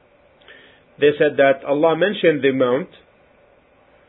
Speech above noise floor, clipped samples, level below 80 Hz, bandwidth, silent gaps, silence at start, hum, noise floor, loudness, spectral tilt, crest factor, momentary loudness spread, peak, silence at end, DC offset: 37 dB; under 0.1%; -66 dBFS; 4 kHz; none; 1 s; none; -54 dBFS; -17 LUFS; -10.5 dB/octave; 18 dB; 4 LU; -2 dBFS; 1.25 s; under 0.1%